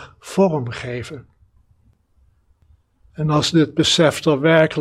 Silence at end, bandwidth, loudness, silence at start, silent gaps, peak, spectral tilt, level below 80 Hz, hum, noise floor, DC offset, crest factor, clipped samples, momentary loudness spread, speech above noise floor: 0 s; 14 kHz; -18 LUFS; 0 s; none; 0 dBFS; -5 dB/octave; -52 dBFS; none; -58 dBFS; under 0.1%; 20 dB; under 0.1%; 14 LU; 41 dB